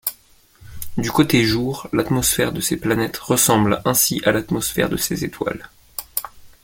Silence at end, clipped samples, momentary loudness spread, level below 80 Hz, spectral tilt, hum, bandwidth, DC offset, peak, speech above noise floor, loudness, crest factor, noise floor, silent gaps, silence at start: 0.15 s; under 0.1%; 12 LU; -44 dBFS; -4 dB/octave; none; 17 kHz; under 0.1%; -2 dBFS; 33 dB; -19 LUFS; 18 dB; -52 dBFS; none; 0.05 s